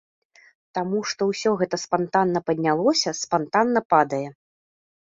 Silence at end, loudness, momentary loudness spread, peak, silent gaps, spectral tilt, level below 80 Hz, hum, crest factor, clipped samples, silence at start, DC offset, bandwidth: 0.75 s; -23 LUFS; 7 LU; -4 dBFS; 3.85-3.90 s; -4.5 dB/octave; -68 dBFS; none; 20 dB; under 0.1%; 0.75 s; under 0.1%; 7.8 kHz